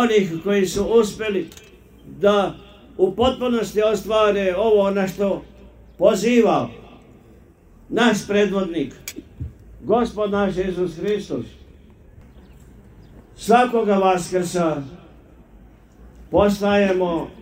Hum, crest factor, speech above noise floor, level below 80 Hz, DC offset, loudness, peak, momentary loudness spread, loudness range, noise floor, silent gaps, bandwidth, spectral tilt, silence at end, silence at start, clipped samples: none; 20 dB; 30 dB; -46 dBFS; under 0.1%; -20 LUFS; 0 dBFS; 15 LU; 5 LU; -49 dBFS; none; 16 kHz; -5.5 dB/octave; 0 s; 0 s; under 0.1%